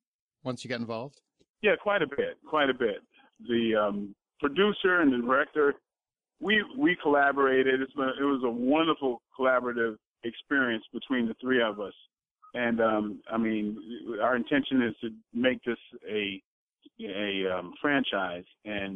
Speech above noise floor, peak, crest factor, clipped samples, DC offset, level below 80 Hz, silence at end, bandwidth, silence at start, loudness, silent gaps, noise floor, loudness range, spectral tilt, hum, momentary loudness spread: over 62 dB; -12 dBFS; 16 dB; under 0.1%; under 0.1%; -66 dBFS; 0 s; 9.4 kHz; 0.45 s; -28 LUFS; 1.50-1.54 s, 10.07-10.11 s, 12.31-12.36 s, 16.45-16.68 s; under -90 dBFS; 5 LU; -6 dB/octave; none; 14 LU